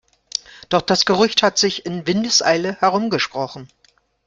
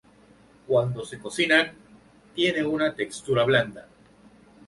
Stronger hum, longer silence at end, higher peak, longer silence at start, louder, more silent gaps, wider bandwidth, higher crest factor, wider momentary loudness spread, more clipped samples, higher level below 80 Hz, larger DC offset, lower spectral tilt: neither; second, 0.6 s vs 0.85 s; about the same, -2 dBFS vs -4 dBFS; second, 0.55 s vs 0.7 s; first, -18 LUFS vs -24 LUFS; neither; about the same, 11 kHz vs 11.5 kHz; about the same, 18 dB vs 22 dB; about the same, 13 LU vs 13 LU; neither; first, -56 dBFS vs -62 dBFS; neither; second, -3 dB/octave vs -5 dB/octave